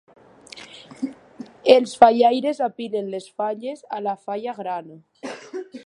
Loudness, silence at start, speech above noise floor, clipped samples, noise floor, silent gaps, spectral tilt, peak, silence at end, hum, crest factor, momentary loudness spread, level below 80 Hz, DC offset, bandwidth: -21 LUFS; 0.55 s; 23 dB; under 0.1%; -44 dBFS; none; -4.5 dB/octave; 0 dBFS; 0.05 s; none; 22 dB; 25 LU; -66 dBFS; under 0.1%; 11 kHz